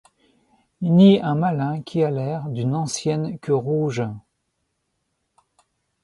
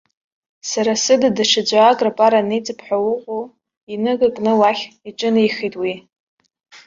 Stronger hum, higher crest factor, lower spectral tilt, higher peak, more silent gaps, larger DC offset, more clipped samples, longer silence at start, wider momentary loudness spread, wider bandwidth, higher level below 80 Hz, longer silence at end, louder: neither; about the same, 18 dB vs 18 dB; first, -7 dB/octave vs -3.5 dB/octave; second, -4 dBFS vs 0 dBFS; second, none vs 3.77-3.87 s, 6.20-6.38 s; neither; neither; first, 0.8 s vs 0.65 s; about the same, 13 LU vs 14 LU; first, 11.5 kHz vs 7.6 kHz; about the same, -62 dBFS vs -62 dBFS; first, 1.85 s vs 0.1 s; second, -21 LUFS vs -17 LUFS